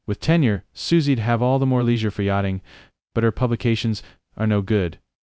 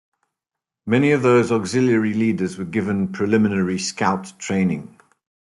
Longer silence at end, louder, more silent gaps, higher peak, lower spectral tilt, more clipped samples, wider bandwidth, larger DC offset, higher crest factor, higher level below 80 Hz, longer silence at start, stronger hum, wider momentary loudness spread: second, 0.25 s vs 0.55 s; about the same, -21 LUFS vs -20 LUFS; neither; about the same, -4 dBFS vs -4 dBFS; first, -7.5 dB/octave vs -6 dB/octave; neither; second, 8 kHz vs 11.5 kHz; neither; about the same, 16 dB vs 16 dB; first, -42 dBFS vs -62 dBFS; second, 0.1 s vs 0.85 s; neither; about the same, 8 LU vs 8 LU